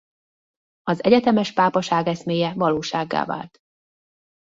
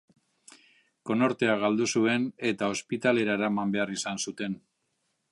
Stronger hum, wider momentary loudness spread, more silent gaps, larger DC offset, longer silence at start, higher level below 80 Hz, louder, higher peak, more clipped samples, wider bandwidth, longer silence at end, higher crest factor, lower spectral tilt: neither; first, 12 LU vs 8 LU; neither; neither; second, 0.85 s vs 1.05 s; first, -62 dBFS vs -72 dBFS; first, -21 LUFS vs -28 LUFS; first, -2 dBFS vs -8 dBFS; neither; second, 7.8 kHz vs 11.5 kHz; first, 1 s vs 0.75 s; about the same, 20 dB vs 20 dB; first, -6 dB/octave vs -4.5 dB/octave